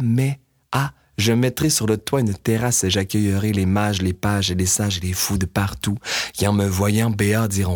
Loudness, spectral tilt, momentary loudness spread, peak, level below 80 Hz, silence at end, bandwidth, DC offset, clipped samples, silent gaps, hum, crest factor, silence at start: -20 LUFS; -4.5 dB/octave; 5 LU; -4 dBFS; -44 dBFS; 0 s; 19.5 kHz; under 0.1%; under 0.1%; none; none; 16 dB; 0 s